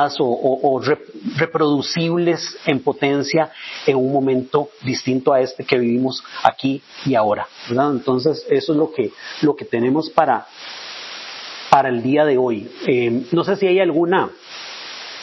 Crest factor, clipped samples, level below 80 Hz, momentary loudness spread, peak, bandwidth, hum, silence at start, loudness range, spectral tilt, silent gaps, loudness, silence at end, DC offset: 18 dB; under 0.1%; -62 dBFS; 14 LU; 0 dBFS; 7.4 kHz; none; 0 s; 2 LU; -6 dB/octave; none; -19 LUFS; 0 s; under 0.1%